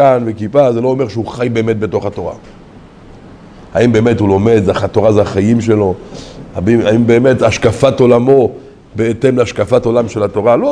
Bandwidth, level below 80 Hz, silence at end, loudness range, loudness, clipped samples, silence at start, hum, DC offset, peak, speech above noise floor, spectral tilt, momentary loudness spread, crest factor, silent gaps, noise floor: 10.5 kHz; -40 dBFS; 0 s; 5 LU; -12 LUFS; 0.2%; 0 s; none; under 0.1%; 0 dBFS; 25 dB; -7 dB/octave; 10 LU; 12 dB; none; -36 dBFS